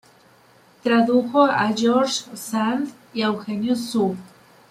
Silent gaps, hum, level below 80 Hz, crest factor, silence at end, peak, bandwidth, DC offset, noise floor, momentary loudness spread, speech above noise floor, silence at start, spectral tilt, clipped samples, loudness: none; none; -66 dBFS; 18 dB; 0.45 s; -4 dBFS; 15 kHz; under 0.1%; -53 dBFS; 10 LU; 33 dB; 0.85 s; -4.5 dB/octave; under 0.1%; -21 LUFS